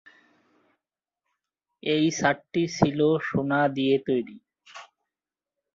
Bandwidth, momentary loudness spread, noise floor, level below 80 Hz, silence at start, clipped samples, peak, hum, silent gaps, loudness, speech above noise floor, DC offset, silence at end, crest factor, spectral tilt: 7.6 kHz; 18 LU; under -90 dBFS; -62 dBFS; 1.85 s; under 0.1%; -4 dBFS; none; none; -25 LUFS; over 66 dB; under 0.1%; 0.9 s; 22 dB; -5.5 dB/octave